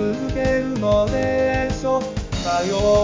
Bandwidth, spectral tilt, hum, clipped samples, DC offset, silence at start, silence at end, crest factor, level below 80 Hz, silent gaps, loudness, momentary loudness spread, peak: 7.6 kHz; -5.5 dB/octave; none; under 0.1%; 0.2%; 0 s; 0 s; 14 dB; -32 dBFS; none; -21 LUFS; 5 LU; -6 dBFS